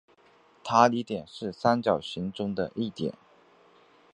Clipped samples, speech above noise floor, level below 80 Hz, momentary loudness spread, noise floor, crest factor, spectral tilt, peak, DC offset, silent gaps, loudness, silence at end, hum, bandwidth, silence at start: under 0.1%; 33 dB; -64 dBFS; 13 LU; -60 dBFS; 24 dB; -5.5 dB/octave; -4 dBFS; under 0.1%; none; -28 LUFS; 1.05 s; none; 10 kHz; 0.65 s